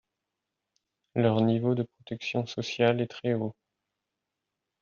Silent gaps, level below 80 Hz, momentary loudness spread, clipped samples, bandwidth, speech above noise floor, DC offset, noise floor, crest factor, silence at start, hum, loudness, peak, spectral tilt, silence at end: none; -70 dBFS; 11 LU; under 0.1%; 7 kHz; 58 dB; under 0.1%; -86 dBFS; 20 dB; 1.15 s; none; -29 LUFS; -10 dBFS; -6 dB/octave; 1.3 s